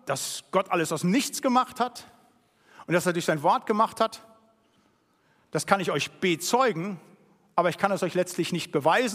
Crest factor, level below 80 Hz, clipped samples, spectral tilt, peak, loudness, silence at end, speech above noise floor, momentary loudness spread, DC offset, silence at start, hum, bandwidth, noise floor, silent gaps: 24 dB; -74 dBFS; under 0.1%; -4 dB/octave; -4 dBFS; -26 LUFS; 0 s; 40 dB; 7 LU; under 0.1%; 0.05 s; none; 15.5 kHz; -66 dBFS; none